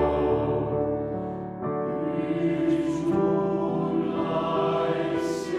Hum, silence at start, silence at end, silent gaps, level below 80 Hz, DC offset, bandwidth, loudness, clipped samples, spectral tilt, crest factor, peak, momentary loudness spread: none; 0 s; 0 s; none; -48 dBFS; under 0.1%; 11 kHz; -26 LUFS; under 0.1%; -7.5 dB/octave; 12 dB; -12 dBFS; 6 LU